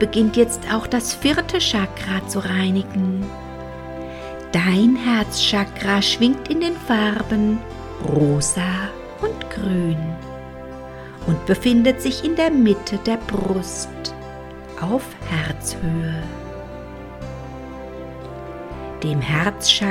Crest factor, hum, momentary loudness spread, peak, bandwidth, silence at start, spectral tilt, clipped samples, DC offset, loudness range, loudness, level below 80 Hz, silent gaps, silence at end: 20 dB; none; 18 LU; -2 dBFS; 17 kHz; 0 s; -4.5 dB/octave; under 0.1%; under 0.1%; 8 LU; -20 LUFS; -40 dBFS; none; 0 s